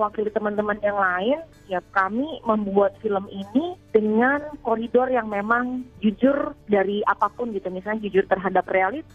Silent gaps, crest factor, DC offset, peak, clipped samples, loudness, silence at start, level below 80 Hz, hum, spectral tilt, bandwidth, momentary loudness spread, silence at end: none; 18 dB; under 0.1%; -6 dBFS; under 0.1%; -23 LUFS; 0 s; -54 dBFS; none; -8 dB/octave; 7 kHz; 7 LU; 0.15 s